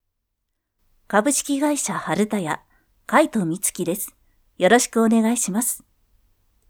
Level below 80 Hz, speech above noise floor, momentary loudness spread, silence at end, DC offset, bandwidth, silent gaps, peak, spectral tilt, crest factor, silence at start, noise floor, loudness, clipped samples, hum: -60 dBFS; 57 dB; 10 LU; 0.9 s; under 0.1%; 18.5 kHz; none; 0 dBFS; -3.5 dB/octave; 22 dB; 1.1 s; -77 dBFS; -21 LUFS; under 0.1%; none